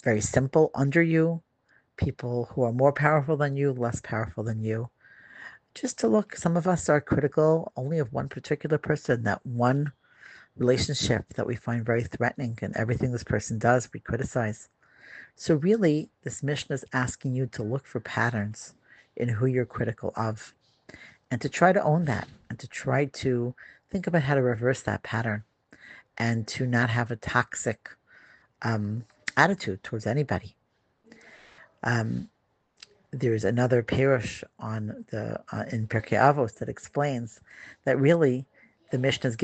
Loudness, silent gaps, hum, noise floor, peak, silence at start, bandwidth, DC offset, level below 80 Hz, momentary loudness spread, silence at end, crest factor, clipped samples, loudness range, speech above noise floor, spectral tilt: -27 LUFS; none; none; -71 dBFS; -4 dBFS; 0.05 s; 9 kHz; under 0.1%; -56 dBFS; 13 LU; 0 s; 24 dB; under 0.1%; 4 LU; 44 dB; -6 dB/octave